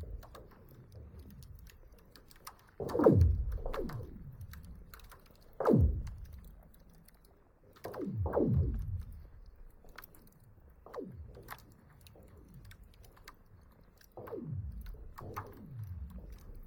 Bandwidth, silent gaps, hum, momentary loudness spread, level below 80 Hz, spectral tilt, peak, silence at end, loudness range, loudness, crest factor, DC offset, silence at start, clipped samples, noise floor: 18 kHz; none; none; 28 LU; -44 dBFS; -9 dB/octave; -12 dBFS; 0 s; 18 LU; -34 LUFS; 26 dB; under 0.1%; 0 s; under 0.1%; -63 dBFS